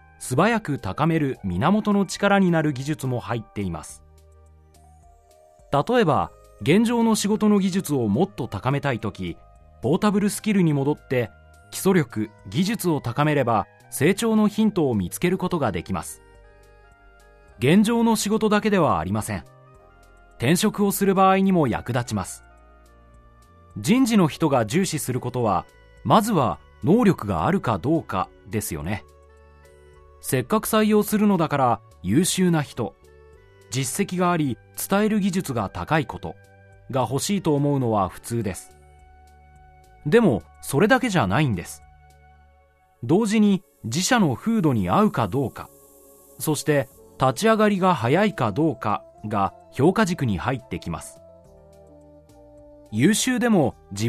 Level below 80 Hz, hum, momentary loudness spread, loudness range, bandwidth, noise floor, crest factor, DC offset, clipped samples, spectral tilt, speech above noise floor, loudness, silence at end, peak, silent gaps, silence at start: -50 dBFS; none; 12 LU; 4 LU; 14 kHz; -58 dBFS; 18 dB; under 0.1%; under 0.1%; -5.5 dB/octave; 37 dB; -22 LUFS; 0 s; -4 dBFS; none; 0.2 s